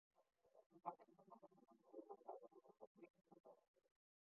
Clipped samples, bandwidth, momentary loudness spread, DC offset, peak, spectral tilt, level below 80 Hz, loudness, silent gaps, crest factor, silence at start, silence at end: under 0.1%; 2.7 kHz; 12 LU; under 0.1%; -34 dBFS; -3 dB/octave; under -90 dBFS; -62 LUFS; 0.66-0.70 s, 2.87-2.95 s, 3.10-3.14 s, 3.40-3.44 s, 3.68-3.74 s; 30 dB; 0.15 s; 0.4 s